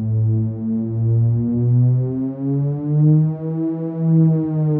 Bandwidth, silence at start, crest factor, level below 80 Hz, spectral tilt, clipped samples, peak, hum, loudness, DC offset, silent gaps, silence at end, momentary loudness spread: 1.9 kHz; 0 s; 10 dB; -50 dBFS; -15.5 dB/octave; under 0.1%; -6 dBFS; none; -18 LUFS; under 0.1%; none; 0 s; 7 LU